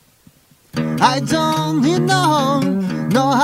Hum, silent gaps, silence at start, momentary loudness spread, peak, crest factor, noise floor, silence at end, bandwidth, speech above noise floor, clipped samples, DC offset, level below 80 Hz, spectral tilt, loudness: none; none; 0.75 s; 7 LU; 0 dBFS; 16 dB; -51 dBFS; 0 s; 16 kHz; 36 dB; under 0.1%; under 0.1%; -52 dBFS; -5 dB/octave; -17 LUFS